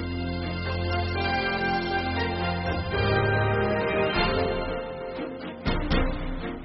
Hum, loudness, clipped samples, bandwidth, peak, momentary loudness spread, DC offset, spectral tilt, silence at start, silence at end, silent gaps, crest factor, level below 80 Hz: none; -27 LUFS; under 0.1%; 5.8 kHz; -10 dBFS; 9 LU; under 0.1%; -4 dB/octave; 0 s; 0 s; none; 16 dB; -36 dBFS